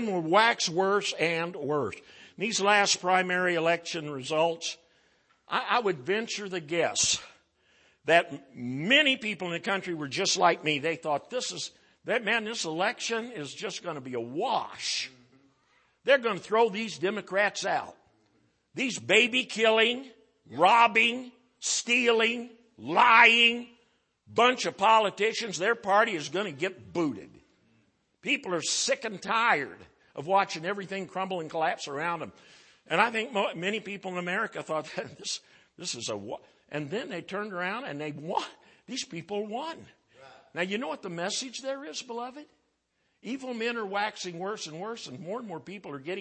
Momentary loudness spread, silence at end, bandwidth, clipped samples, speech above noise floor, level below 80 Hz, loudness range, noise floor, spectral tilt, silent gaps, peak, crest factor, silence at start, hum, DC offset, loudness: 16 LU; 0 s; 8.8 kHz; under 0.1%; 47 dB; -76 dBFS; 12 LU; -75 dBFS; -2.5 dB/octave; none; -4 dBFS; 24 dB; 0 s; none; under 0.1%; -27 LUFS